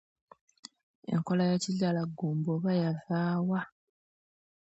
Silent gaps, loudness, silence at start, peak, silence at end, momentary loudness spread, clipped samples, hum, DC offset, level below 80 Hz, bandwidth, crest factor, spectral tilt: none; -31 LUFS; 1.1 s; -18 dBFS; 1 s; 21 LU; under 0.1%; none; under 0.1%; -74 dBFS; 8.2 kHz; 14 dB; -6.5 dB/octave